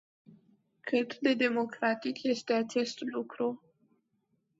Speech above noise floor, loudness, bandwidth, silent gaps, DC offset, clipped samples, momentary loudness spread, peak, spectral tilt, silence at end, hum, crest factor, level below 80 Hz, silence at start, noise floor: 46 dB; -32 LUFS; 8 kHz; none; under 0.1%; under 0.1%; 9 LU; -14 dBFS; -4 dB/octave; 1 s; none; 20 dB; -80 dBFS; 0.85 s; -77 dBFS